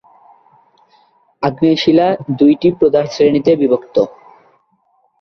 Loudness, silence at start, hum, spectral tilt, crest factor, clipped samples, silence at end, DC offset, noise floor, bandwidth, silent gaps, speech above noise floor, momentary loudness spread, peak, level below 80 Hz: -13 LUFS; 1.4 s; none; -7 dB/octave; 14 dB; under 0.1%; 1.1 s; under 0.1%; -59 dBFS; 6.4 kHz; none; 47 dB; 6 LU; -2 dBFS; -54 dBFS